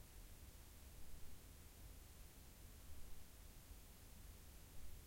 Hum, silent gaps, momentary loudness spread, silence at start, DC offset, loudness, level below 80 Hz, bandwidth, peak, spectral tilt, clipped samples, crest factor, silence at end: none; none; 1 LU; 0 s; under 0.1%; -62 LUFS; -62 dBFS; 16.5 kHz; -40 dBFS; -3.5 dB/octave; under 0.1%; 16 dB; 0 s